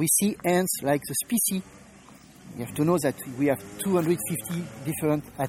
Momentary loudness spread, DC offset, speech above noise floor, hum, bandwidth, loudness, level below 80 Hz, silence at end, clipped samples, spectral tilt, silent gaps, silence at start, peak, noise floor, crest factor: 9 LU; under 0.1%; 24 dB; none; 16.5 kHz; -26 LUFS; -60 dBFS; 0 s; under 0.1%; -4.5 dB/octave; none; 0 s; -10 dBFS; -50 dBFS; 18 dB